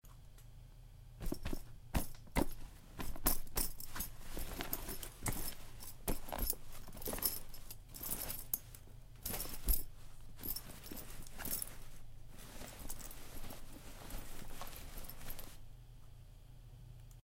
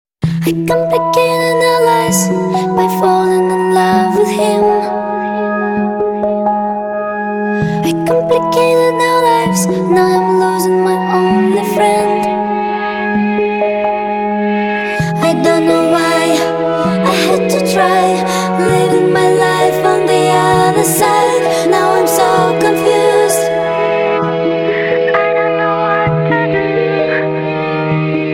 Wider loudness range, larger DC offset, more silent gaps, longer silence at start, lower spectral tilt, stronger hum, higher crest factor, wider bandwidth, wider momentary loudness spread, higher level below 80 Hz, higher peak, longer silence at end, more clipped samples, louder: first, 10 LU vs 3 LU; neither; neither; second, 0.05 s vs 0.2 s; second, -3.5 dB/octave vs -5 dB/octave; neither; first, 26 dB vs 12 dB; about the same, 17 kHz vs 18 kHz; first, 21 LU vs 5 LU; about the same, -46 dBFS vs -46 dBFS; second, -16 dBFS vs 0 dBFS; about the same, 0.05 s vs 0 s; neither; second, -43 LUFS vs -12 LUFS